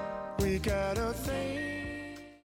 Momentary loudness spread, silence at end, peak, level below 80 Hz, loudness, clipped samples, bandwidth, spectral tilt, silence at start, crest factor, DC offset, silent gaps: 9 LU; 0.05 s; -18 dBFS; -44 dBFS; -34 LUFS; under 0.1%; 17.5 kHz; -5.5 dB/octave; 0 s; 16 dB; under 0.1%; none